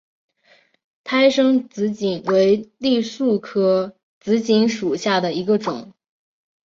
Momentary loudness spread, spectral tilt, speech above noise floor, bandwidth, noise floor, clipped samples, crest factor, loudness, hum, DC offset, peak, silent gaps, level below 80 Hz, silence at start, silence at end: 9 LU; -5.5 dB/octave; 39 dB; 7.6 kHz; -57 dBFS; under 0.1%; 16 dB; -19 LUFS; none; under 0.1%; -4 dBFS; 4.03-4.21 s; -64 dBFS; 1.05 s; 0.8 s